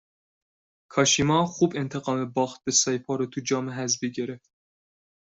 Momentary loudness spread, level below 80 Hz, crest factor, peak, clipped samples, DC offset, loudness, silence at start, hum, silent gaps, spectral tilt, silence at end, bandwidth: 10 LU; -62 dBFS; 20 dB; -6 dBFS; under 0.1%; under 0.1%; -25 LUFS; 0.9 s; none; none; -3.5 dB/octave; 0.95 s; 8.2 kHz